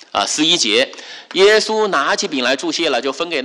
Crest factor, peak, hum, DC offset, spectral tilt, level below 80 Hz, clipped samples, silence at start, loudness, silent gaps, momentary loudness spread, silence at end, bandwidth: 14 dB; -2 dBFS; none; under 0.1%; -1.5 dB/octave; -60 dBFS; under 0.1%; 0.15 s; -15 LUFS; none; 8 LU; 0 s; 12 kHz